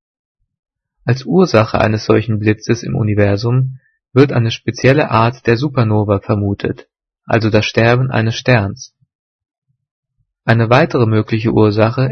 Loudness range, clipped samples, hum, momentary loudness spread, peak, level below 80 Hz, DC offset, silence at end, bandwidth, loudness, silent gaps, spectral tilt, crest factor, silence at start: 2 LU; under 0.1%; none; 7 LU; 0 dBFS; -44 dBFS; under 0.1%; 0 s; 6.6 kHz; -14 LUFS; 9.15-9.39 s, 9.58-9.62 s, 9.91-10.03 s; -7 dB/octave; 14 dB; 1.05 s